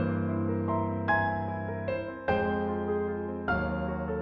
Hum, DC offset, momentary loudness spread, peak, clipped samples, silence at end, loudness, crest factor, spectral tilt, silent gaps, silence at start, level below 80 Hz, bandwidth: none; under 0.1%; 6 LU; -14 dBFS; under 0.1%; 0 s; -30 LUFS; 16 dB; -10 dB/octave; none; 0 s; -48 dBFS; 5.4 kHz